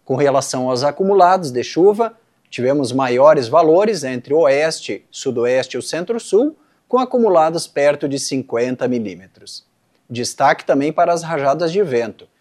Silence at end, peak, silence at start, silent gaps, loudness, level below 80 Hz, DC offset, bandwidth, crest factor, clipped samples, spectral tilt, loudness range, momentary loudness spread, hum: 0.15 s; 0 dBFS; 0.1 s; none; -16 LUFS; -68 dBFS; under 0.1%; 13 kHz; 16 dB; under 0.1%; -5 dB/octave; 5 LU; 12 LU; none